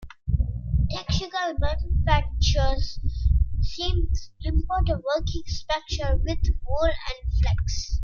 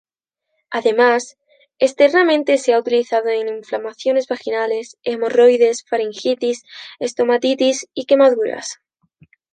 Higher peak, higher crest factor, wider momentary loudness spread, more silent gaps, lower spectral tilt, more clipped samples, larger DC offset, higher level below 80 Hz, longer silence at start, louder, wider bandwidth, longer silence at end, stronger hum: second, -6 dBFS vs -2 dBFS; about the same, 16 dB vs 16 dB; second, 6 LU vs 13 LU; neither; first, -5.5 dB/octave vs -2.5 dB/octave; neither; neither; first, -26 dBFS vs -72 dBFS; second, 0 s vs 0.7 s; second, -26 LUFS vs -17 LUFS; second, 7.2 kHz vs 9.4 kHz; second, 0 s vs 0.8 s; neither